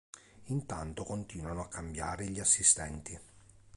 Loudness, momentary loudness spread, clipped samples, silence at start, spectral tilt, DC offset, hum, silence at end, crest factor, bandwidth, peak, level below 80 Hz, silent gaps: -32 LUFS; 17 LU; under 0.1%; 0.15 s; -3 dB/octave; under 0.1%; none; 0.1 s; 24 dB; 11.5 kHz; -10 dBFS; -52 dBFS; none